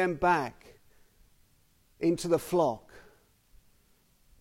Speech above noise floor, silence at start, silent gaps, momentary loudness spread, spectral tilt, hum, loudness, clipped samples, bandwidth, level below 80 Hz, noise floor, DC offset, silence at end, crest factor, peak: 38 dB; 0 s; none; 9 LU; -5.5 dB/octave; none; -29 LUFS; under 0.1%; 16.5 kHz; -58 dBFS; -66 dBFS; under 0.1%; 1.4 s; 20 dB; -14 dBFS